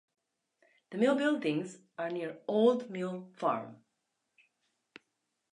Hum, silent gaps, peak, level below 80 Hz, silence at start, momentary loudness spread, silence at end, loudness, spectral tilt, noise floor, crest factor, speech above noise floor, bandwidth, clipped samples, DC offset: none; none; -14 dBFS; -88 dBFS; 0.9 s; 12 LU; 1.8 s; -32 LUFS; -6 dB/octave; -83 dBFS; 20 dB; 51 dB; 10.5 kHz; under 0.1%; under 0.1%